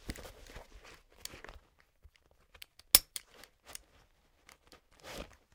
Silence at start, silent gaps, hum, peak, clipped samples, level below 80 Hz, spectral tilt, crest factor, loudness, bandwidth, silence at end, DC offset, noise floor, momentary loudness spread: 0.05 s; none; none; -2 dBFS; under 0.1%; -58 dBFS; 0 dB/octave; 38 dB; -27 LUFS; 17 kHz; 0.3 s; under 0.1%; -68 dBFS; 29 LU